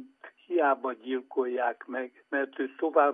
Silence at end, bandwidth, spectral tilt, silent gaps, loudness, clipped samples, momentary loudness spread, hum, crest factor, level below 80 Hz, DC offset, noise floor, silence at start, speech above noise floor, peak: 0 s; 3.7 kHz; -6.5 dB/octave; none; -30 LUFS; under 0.1%; 10 LU; none; 20 dB; under -90 dBFS; under 0.1%; -51 dBFS; 0 s; 22 dB; -10 dBFS